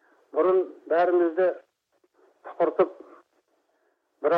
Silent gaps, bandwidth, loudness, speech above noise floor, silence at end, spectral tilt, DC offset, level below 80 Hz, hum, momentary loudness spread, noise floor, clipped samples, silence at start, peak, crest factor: none; 4.9 kHz; -25 LUFS; 47 dB; 0 s; -8 dB/octave; under 0.1%; -86 dBFS; none; 9 LU; -71 dBFS; under 0.1%; 0.35 s; -8 dBFS; 18 dB